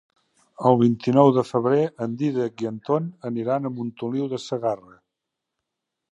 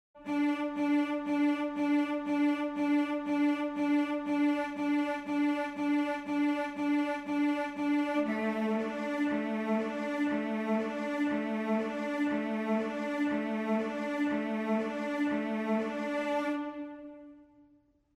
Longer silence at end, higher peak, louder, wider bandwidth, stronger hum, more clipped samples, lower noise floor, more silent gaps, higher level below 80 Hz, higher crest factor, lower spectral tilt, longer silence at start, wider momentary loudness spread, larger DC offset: first, 1.35 s vs 0.75 s; first, -2 dBFS vs -20 dBFS; first, -23 LUFS vs -32 LUFS; first, 10.5 kHz vs 9 kHz; neither; neither; first, -83 dBFS vs -66 dBFS; neither; about the same, -68 dBFS vs -72 dBFS; first, 22 dB vs 12 dB; first, -8 dB/octave vs -6 dB/octave; first, 0.6 s vs 0.15 s; first, 12 LU vs 4 LU; neither